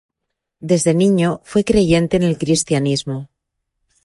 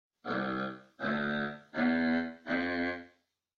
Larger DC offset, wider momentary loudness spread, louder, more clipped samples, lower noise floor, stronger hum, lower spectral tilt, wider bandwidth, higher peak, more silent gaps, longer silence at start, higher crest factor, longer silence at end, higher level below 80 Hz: neither; about the same, 9 LU vs 8 LU; first, -16 LUFS vs -33 LUFS; neither; first, -78 dBFS vs -69 dBFS; neither; second, -5.5 dB/octave vs -7 dB/octave; first, 11.5 kHz vs 6.4 kHz; first, -2 dBFS vs -18 dBFS; neither; first, 0.6 s vs 0.25 s; about the same, 16 dB vs 16 dB; first, 0.8 s vs 0.5 s; first, -42 dBFS vs -66 dBFS